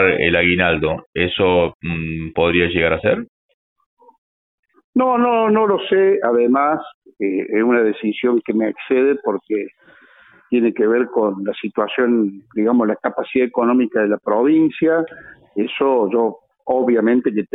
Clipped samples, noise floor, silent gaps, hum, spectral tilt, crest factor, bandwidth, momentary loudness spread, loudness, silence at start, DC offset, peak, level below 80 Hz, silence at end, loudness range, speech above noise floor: under 0.1%; -49 dBFS; 1.06-1.13 s, 1.75-1.80 s, 3.29-3.76 s, 3.86-3.97 s, 4.18-4.63 s, 4.84-4.93 s, 6.94-7.02 s; none; -10.5 dB/octave; 16 dB; 4.1 kHz; 9 LU; -17 LUFS; 0 s; under 0.1%; -2 dBFS; -48 dBFS; 0.1 s; 3 LU; 32 dB